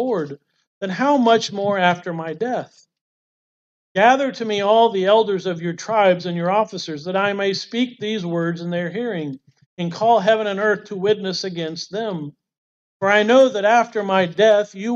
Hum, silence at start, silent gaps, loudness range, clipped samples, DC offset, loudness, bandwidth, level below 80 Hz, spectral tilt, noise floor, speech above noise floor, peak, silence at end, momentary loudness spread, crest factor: none; 0 s; 0.67-0.81 s, 3.01-3.95 s, 9.66-9.77 s, 12.58-13.00 s; 4 LU; under 0.1%; under 0.1%; -19 LUFS; 7.8 kHz; -72 dBFS; -5 dB/octave; under -90 dBFS; over 71 dB; -4 dBFS; 0 s; 12 LU; 16 dB